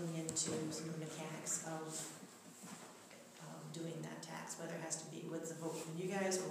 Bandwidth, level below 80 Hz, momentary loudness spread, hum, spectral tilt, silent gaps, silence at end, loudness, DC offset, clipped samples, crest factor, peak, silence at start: 15.5 kHz; -88 dBFS; 16 LU; none; -3.5 dB/octave; none; 0 s; -44 LUFS; under 0.1%; under 0.1%; 22 dB; -22 dBFS; 0 s